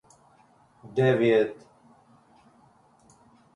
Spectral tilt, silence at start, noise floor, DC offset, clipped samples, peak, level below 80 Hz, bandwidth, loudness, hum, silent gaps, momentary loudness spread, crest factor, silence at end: -7.5 dB/octave; 0.85 s; -60 dBFS; under 0.1%; under 0.1%; -12 dBFS; -68 dBFS; 10.5 kHz; -24 LUFS; none; none; 13 LU; 18 dB; 2 s